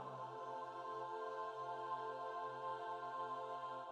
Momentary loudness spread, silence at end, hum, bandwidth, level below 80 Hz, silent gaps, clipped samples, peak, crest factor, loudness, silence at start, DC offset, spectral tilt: 3 LU; 0 s; none; 11 kHz; under -90 dBFS; none; under 0.1%; -34 dBFS; 14 dB; -47 LUFS; 0 s; under 0.1%; -5 dB/octave